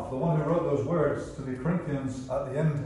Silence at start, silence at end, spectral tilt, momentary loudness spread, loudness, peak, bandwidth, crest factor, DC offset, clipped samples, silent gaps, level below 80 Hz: 0 s; 0 s; -8.5 dB/octave; 7 LU; -29 LUFS; -14 dBFS; 11 kHz; 16 dB; under 0.1%; under 0.1%; none; -50 dBFS